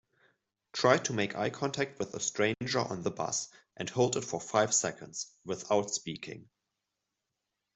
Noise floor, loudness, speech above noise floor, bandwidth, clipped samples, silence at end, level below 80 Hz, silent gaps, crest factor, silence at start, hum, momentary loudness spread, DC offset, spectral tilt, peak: -86 dBFS; -32 LUFS; 54 dB; 8.2 kHz; under 0.1%; 1.3 s; -72 dBFS; none; 26 dB; 0.75 s; none; 14 LU; under 0.1%; -3.5 dB/octave; -8 dBFS